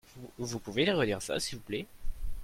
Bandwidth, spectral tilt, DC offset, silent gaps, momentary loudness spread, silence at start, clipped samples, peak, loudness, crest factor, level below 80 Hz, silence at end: 16 kHz; -4 dB/octave; under 0.1%; none; 18 LU; 0.1 s; under 0.1%; -16 dBFS; -33 LUFS; 18 dB; -42 dBFS; 0 s